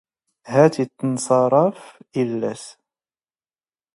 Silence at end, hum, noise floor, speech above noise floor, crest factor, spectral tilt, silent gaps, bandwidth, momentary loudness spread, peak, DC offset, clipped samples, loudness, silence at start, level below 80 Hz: 1.25 s; none; under -90 dBFS; over 71 dB; 20 dB; -6.5 dB/octave; none; 11.5 kHz; 13 LU; 0 dBFS; under 0.1%; under 0.1%; -20 LUFS; 0.45 s; -68 dBFS